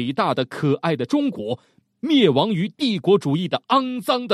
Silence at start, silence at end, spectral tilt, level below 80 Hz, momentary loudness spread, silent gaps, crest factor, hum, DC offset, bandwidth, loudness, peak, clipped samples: 0 s; 0 s; -6.5 dB/octave; -66 dBFS; 8 LU; none; 18 dB; none; under 0.1%; 14 kHz; -21 LUFS; -4 dBFS; under 0.1%